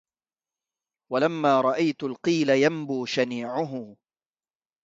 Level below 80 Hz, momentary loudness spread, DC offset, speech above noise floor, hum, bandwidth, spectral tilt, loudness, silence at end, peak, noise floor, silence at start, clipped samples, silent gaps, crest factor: -72 dBFS; 9 LU; under 0.1%; over 66 dB; none; 7.8 kHz; -5.5 dB/octave; -25 LUFS; 0.9 s; -8 dBFS; under -90 dBFS; 1.1 s; under 0.1%; none; 18 dB